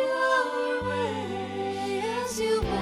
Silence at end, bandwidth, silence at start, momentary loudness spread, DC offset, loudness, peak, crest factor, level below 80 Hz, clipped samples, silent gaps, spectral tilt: 0 s; 15.5 kHz; 0 s; 7 LU; under 0.1%; -28 LUFS; -12 dBFS; 16 dB; -46 dBFS; under 0.1%; none; -4 dB/octave